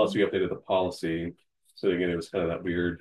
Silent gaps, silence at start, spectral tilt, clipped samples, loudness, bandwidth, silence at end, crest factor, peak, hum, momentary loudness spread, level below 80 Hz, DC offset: none; 0 s; -6.5 dB/octave; under 0.1%; -29 LUFS; 12.5 kHz; 0.05 s; 16 dB; -12 dBFS; none; 5 LU; -60 dBFS; under 0.1%